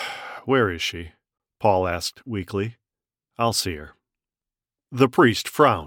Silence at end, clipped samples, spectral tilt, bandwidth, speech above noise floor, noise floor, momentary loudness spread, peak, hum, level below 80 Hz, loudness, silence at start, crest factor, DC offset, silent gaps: 0 s; under 0.1%; -4.5 dB/octave; 18 kHz; over 69 dB; under -90 dBFS; 15 LU; -4 dBFS; none; -52 dBFS; -22 LUFS; 0 s; 20 dB; under 0.1%; none